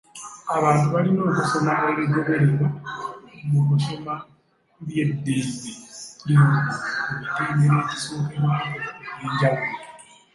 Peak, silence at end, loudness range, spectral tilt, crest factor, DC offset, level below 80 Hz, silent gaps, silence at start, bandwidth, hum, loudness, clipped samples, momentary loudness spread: -6 dBFS; 0.35 s; 4 LU; -6.5 dB/octave; 16 dB; under 0.1%; -60 dBFS; none; 0.15 s; 11.5 kHz; none; -22 LUFS; under 0.1%; 15 LU